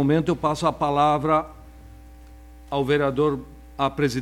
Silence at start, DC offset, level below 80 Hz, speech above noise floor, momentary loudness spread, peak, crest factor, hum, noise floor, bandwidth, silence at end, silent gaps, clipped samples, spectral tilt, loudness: 0 s; under 0.1%; -46 dBFS; 23 dB; 10 LU; -6 dBFS; 16 dB; none; -44 dBFS; 15.5 kHz; 0 s; none; under 0.1%; -6.5 dB/octave; -23 LUFS